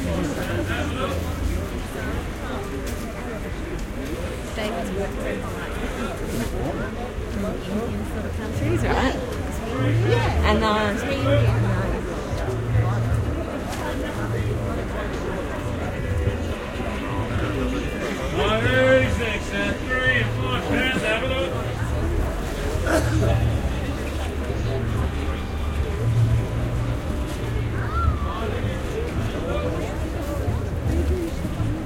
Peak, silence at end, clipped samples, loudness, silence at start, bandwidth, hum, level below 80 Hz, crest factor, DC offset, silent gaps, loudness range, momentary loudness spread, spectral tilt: -6 dBFS; 0 s; under 0.1%; -25 LUFS; 0 s; 16.5 kHz; none; -30 dBFS; 18 dB; under 0.1%; none; 7 LU; 9 LU; -6 dB/octave